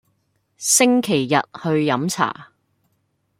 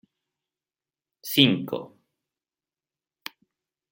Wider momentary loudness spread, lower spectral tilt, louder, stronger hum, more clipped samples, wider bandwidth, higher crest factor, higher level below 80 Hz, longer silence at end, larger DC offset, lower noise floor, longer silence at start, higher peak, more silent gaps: second, 9 LU vs 22 LU; about the same, -3.5 dB/octave vs -4.5 dB/octave; first, -18 LUFS vs -22 LUFS; neither; neither; about the same, 16.5 kHz vs 16.5 kHz; second, 18 dB vs 28 dB; first, -64 dBFS vs -70 dBFS; second, 0.95 s vs 2.05 s; neither; second, -68 dBFS vs under -90 dBFS; second, 0.6 s vs 1.25 s; about the same, -2 dBFS vs -2 dBFS; neither